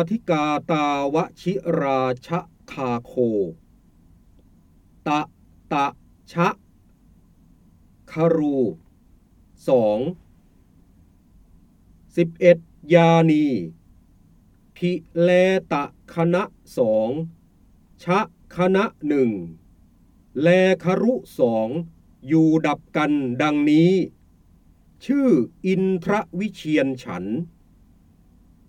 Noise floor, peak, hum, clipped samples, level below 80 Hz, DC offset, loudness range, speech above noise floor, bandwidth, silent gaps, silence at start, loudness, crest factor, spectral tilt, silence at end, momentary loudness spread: -54 dBFS; -2 dBFS; none; under 0.1%; -56 dBFS; under 0.1%; 7 LU; 34 dB; 12 kHz; none; 0 s; -21 LUFS; 22 dB; -7.5 dB/octave; 1.2 s; 14 LU